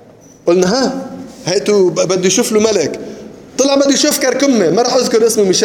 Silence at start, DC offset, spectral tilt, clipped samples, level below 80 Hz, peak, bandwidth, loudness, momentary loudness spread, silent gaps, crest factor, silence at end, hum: 0.45 s; under 0.1%; -3.5 dB/octave; under 0.1%; -54 dBFS; 0 dBFS; 19 kHz; -12 LUFS; 14 LU; none; 12 dB; 0 s; none